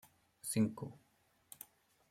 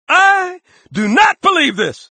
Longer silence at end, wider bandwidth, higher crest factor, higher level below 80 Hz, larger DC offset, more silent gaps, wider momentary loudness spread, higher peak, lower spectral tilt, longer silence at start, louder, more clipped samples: first, 1.15 s vs 0.2 s; first, 16.5 kHz vs 9.4 kHz; first, 22 dB vs 14 dB; second, -76 dBFS vs -56 dBFS; neither; neither; first, 20 LU vs 12 LU; second, -22 dBFS vs 0 dBFS; first, -5.5 dB/octave vs -3.5 dB/octave; first, 0.45 s vs 0.1 s; second, -39 LUFS vs -12 LUFS; neither